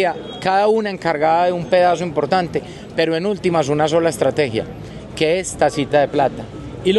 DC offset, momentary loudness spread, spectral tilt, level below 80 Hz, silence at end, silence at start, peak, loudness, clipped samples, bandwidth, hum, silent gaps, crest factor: under 0.1%; 10 LU; -5 dB/octave; -46 dBFS; 0 s; 0 s; -2 dBFS; -18 LUFS; under 0.1%; 12.5 kHz; none; none; 16 dB